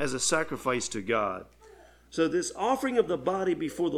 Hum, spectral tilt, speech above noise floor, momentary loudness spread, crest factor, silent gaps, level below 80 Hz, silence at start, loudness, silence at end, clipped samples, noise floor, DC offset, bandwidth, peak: 60 Hz at -60 dBFS; -3.5 dB/octave; 26 dB; 4 LU; 18 dB; none; -60 dBFS; 0 s; -29 LUFS; 0 s; under 0.1%; -54 dBFS; under 0.1%; 15.5 kHz; -12 dBFS